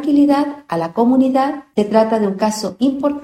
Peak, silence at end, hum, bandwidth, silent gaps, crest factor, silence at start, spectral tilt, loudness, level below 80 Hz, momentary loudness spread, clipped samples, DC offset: 0 dBFS; 0 s; none; 14 kHz; none; 16 dB; 0 s; -6 dB/octave; -16 LUFS; -56 dBFS; 7 LU; under 0.1%; under 0.1%